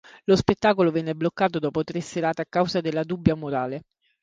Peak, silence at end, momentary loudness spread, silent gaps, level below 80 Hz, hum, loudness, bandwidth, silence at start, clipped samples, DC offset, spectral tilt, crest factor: 0 dBFS; 0.4 s; 8 LU; none; -50 dBFS; none; -24 LUFS; 9.4 kHz; 0.15 s; under 0.1%; under 0.1%; -6.5 dB/octave; 24 dB